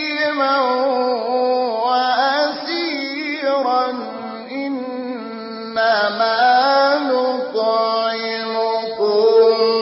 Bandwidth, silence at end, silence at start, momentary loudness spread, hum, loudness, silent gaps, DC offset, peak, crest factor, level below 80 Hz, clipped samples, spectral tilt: 5.8 kHz; 0 s; 0 s; 12 LU; none; -18 LUFS; none; under 0.1%; -4 dBFS; 14 dB; -74 dBFS; under 0.1%; -6.5 dB/octave